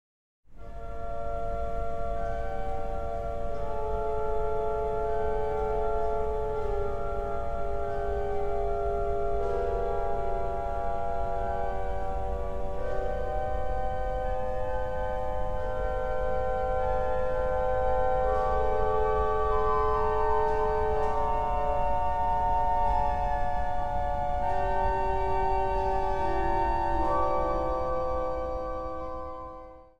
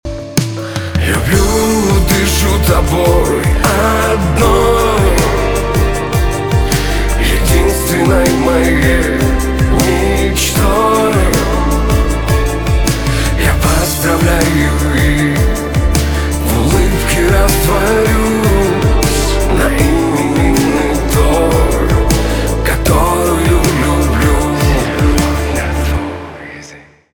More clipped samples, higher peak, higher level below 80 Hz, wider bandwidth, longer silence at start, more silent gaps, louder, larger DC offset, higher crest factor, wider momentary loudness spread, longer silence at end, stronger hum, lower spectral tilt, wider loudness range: neither; second, -14 dBFS vs 0 dBFS; second, -36 dBFS vs -16 dBFS; second, 7.4 kHz vs over 20 kHz; first, 0.5 s vs 0.05 s; neither; second, -30 LUFS vs -12 LUFS; second, under 0.1% vs 2%; about the same, 14 dB vs 12 dB; first, 8 LU vs 4 LU; first, 0.15 s vs 0 s; neither; first, -7.5 dB/octave vs -5 dB/octave; first, 6 LU vs 1 LU